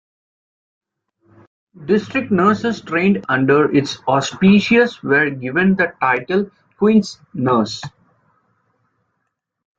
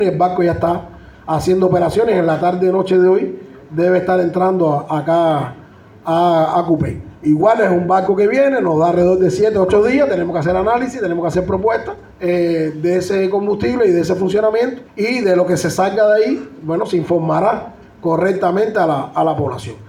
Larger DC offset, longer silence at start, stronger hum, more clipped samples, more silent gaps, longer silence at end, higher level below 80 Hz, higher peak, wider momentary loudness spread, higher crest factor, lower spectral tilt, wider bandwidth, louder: neither; first, 1.8 s vs 0 s; neither; neither; neither; first, 1.9 s vs 0 s; second, -56 dBFS vs -46 dBFS; about the same, -2 dBFS vs -2 dBFS; about the same, 9 LU vs 8 LU; about the same, 16 dB vs 14 dB; about the same, -6 dB/octave vs -7 dB/octave; second, 7.8 kHz vs 12.5 kHz; about the same, -16 LUFS vs -15 LUFS